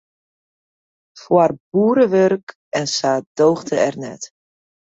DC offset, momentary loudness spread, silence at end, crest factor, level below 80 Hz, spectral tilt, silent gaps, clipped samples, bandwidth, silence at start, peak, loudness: under 0.1%; 15 LU; 0.7 s; 18 dB; -62 dBFS; -5 dB/octave; 1.60-1.72 s, 2.43-2.47 s, 2.55-2.72 s, 3.26-3.35 s; under 0.1%; 8 kHz; 1.15 s; -2 dBFS; -17 LUFS